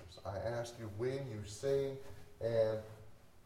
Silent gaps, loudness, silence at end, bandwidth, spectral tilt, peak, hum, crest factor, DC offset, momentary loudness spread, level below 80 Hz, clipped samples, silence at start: none; -39 LUFS; 0.05 s; 16 kHz; -6 dB/octave; -22 dBFS; none; 18 dB; under 0.1%; 16 LU; -64 dBFS; under 0.1%; 0 s